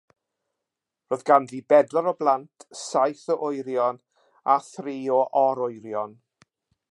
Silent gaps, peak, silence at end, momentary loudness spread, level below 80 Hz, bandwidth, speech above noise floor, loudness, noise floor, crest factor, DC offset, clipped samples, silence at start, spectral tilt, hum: none; -4 dBFS; 0.8 s; 12 LU; -82 dBFS; 11.5 kHz; 62 dB; -24 LUFS; -86 dBFS; 22 dB; under 0.1%; under 0.1%; 1.1 s; -5 dB/octave; none